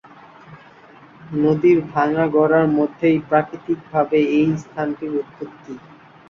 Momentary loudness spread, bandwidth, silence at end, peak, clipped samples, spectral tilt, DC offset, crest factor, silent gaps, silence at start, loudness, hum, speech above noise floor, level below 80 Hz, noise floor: 18 LU; 7 kHz; 0.5 s; -4 dBFS; under 0.1%; -8.5 dB/octave; under 0.1%; 16 dB; none; 0.5 s; -19 LUFS; none; 27 dB; -58 dBFS; -46 dBFS